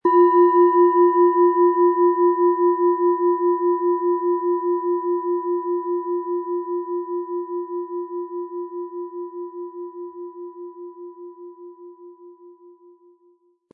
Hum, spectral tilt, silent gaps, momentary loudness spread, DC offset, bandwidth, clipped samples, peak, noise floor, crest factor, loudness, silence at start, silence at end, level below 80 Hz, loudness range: none; -9.5 dB/octave; none; 21 LU; under 0.1%; 1.9 kHz; under 0.1%; -6 dBFS; -60 dBFS; 14 dB; -20 LUFS; 0.05 s; 1.2 s; -86 dBFS; 21 LU